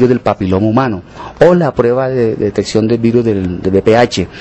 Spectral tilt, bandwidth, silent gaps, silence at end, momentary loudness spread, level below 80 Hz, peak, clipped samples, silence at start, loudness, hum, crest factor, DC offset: -7 dB/octave; 8.4 kHz; none; 0 s; 6 LU; -36 dBFS; 0 dBFS; 0.4%; 0 s; -12 LUFS; none; 12 dB; under 0.1%